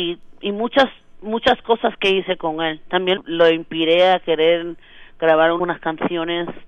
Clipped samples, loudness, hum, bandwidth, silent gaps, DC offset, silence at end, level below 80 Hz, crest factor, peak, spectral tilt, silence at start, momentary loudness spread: under 0.1%; -18 LUFS; none; 7.6 kHz; none; under 0.1%; 0 s; -50 dBFS; 16 dB; -2 dBFS; -5.5 dB/octave; 0 s; 9 LU